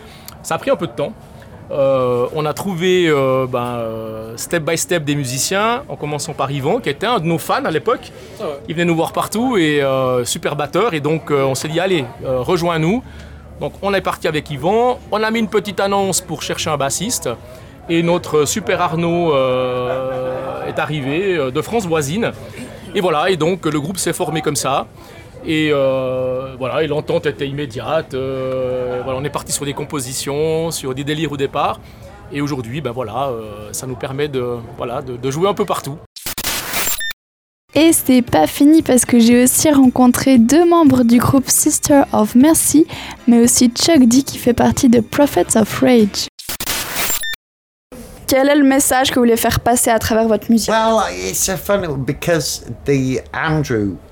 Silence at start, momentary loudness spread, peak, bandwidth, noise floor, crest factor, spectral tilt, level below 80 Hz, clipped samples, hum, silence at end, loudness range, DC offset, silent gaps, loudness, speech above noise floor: 0 s; 12 LU; -2 dBFS; over 20 kHz; under -90 dBFS; 14 dB; -4.5 dB/octave; -42 dBFS; under 0.1%; none; 0.05 s; 9 LU; under 0.1%; 36.06-36.16 s, 37.13-37.68 s, 46.29-46.38 s, 47.35-47.90 s; -16 LUFS; over 74 dB